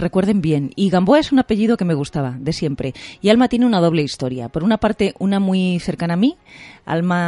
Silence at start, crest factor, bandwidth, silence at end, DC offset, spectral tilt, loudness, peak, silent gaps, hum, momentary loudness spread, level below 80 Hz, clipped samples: 0 s; 16 dB; 11.5 kHz; 0 s; under 0.1%; -7 dB/octave; -18 LUFS; 0 dBFS; none; none; 9 LU; -44 dBFS; under 0.1%